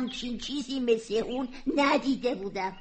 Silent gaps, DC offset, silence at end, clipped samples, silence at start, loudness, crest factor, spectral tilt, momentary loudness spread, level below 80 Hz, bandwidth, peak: none; under 0.1%; 0 s; under 0.1%; 0 s; -29 LUFS; 16 dB; -4 dB/octave; 9 LU; -54 dBFS; 8.8 kHz; -12 dBFS